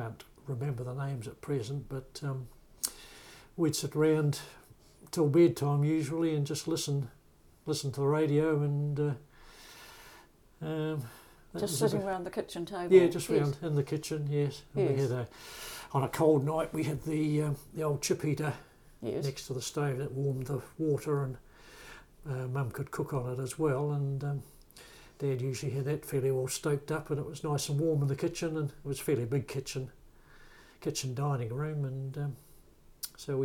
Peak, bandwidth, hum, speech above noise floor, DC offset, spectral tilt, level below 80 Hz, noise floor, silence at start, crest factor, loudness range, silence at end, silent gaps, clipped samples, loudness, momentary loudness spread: -10 dBFS; 18.5 kHz; none; 29 dB; under 0.1%; -6 dB/octave; -60 dBFS; -60 dBFS; 0 s; 22 dB; 7 LU; 0 s; none; under 0.1%; -32 LUFS; 16 LU